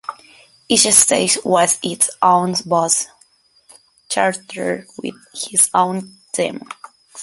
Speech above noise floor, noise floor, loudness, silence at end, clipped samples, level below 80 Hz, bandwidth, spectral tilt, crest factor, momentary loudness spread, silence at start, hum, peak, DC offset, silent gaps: 38 dB; -55 dBFS; -15 LUFS; 0 s; under 0.1%; -60 dBFS; 16 kHz; -2 dB/octave; 18 dB; 19 LU; 0.1 s; none; 0 dBFS; under 0.1%; none